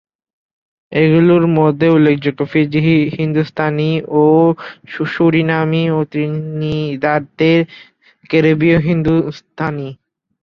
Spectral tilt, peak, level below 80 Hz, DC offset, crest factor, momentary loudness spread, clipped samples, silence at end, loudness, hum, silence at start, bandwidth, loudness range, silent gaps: -9 dB/octave; 0 dBFS; -48 dBFS; under 0.1%; 14 dB; 11 LU; under 0.1%; 0.5 s; -14 LUFS; none; 0.9 s; 6.2 kHz; 3 LU; none